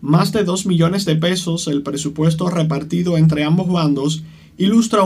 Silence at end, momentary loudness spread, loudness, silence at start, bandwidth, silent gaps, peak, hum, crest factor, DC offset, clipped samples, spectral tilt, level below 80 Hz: 0 s; 6 LU; -17 LUFS; 0 s; 14.5 kHz; none; -2 dBFS; none; 14 dB; under 0.1%; under 0.1%; -6 dB/octave; -50 dBFS